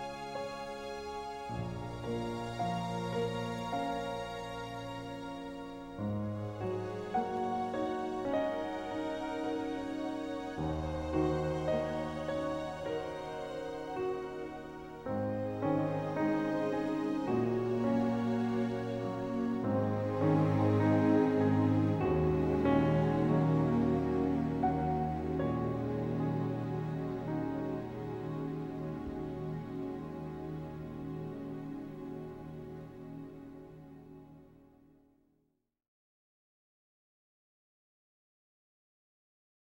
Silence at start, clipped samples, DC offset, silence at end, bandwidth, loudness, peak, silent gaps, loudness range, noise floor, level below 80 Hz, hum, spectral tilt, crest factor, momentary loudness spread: 0 s; under 0.1%; under 0.1%; 5.1 s; 16.5 kHz; -35 LUFS; -16 dBFS; none; 13 LU; -80 dBFS; -54 dBFS; none; -8 dB/octave; 18 dB; 14 LU